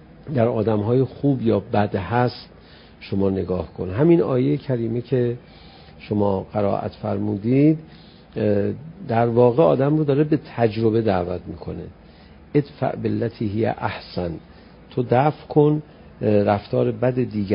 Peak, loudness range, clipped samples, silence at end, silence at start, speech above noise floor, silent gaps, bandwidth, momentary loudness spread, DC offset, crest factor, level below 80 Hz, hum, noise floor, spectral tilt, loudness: -2 dBFS; 4 LU; under 0.1%; 0 s; 0.2 s; 25 dB; none; 5.4 kHz; 11 LU; under 0.1%; 18 dB; -46 dBFS; none; -46 dBFS; -13 dB/octave; -21 LUFS